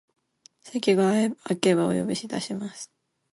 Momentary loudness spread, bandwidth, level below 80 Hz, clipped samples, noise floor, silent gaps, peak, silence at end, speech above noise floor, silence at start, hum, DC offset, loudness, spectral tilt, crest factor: 15 LU; 11.5 kHz; -66 dBFS; under 0.1%; -58 dBFS; none; -6 dBFS; 0.5 s; 34 dB; 0.65 s; none; under 0.1%; -25 LUFS; -5.5 dB/octave; 20 dB